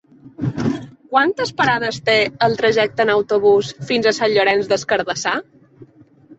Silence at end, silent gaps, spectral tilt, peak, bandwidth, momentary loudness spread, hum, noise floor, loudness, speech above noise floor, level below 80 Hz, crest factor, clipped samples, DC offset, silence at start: 0.05 s; none; -4.5 dB/octave; -2 dBFS; 8.2 kHz; 8 LU; none; -47 dBFS; -17 LUFS; 30 dB; -56 dBFS; 16 dB; under 0.1%; under 0.1%; 0.25 s